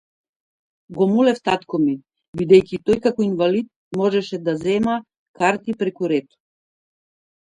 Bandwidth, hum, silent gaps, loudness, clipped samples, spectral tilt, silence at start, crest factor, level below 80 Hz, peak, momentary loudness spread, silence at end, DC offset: 10.5 kHz; none; 2.28-2.33 s, 3.76-3.91 s, 5.17-5.34 s; -20 LUFS; under 0.1%; -6.5 dB/octave; 0.9 s; 18 dB; -56 dBFS; -2 dBFS; 12 LU; 1.25 s; under 0.1%